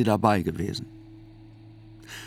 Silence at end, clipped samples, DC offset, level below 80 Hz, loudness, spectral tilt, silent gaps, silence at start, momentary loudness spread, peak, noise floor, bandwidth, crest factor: 0 s; under 0.1%; under 0.1%; -56 dBFS; -26 LUFS; -6.5 dB/octave; none; 0 s; 27 LU; -4 dBFS; -48 dBFS; 18 kHz; 24 dB